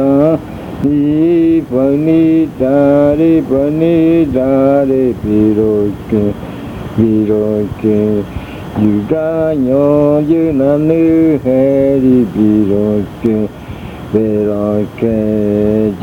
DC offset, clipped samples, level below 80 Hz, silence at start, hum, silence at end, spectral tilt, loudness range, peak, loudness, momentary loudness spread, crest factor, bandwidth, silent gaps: under 0.1%; under 0.1%; -36 dBFS; 0 s; none; 0 s; -9.5 dB/octave; 4 LU; 0 dBFS; -12 LUFS; 8 LU; 12 dB; 6.6 kHz; none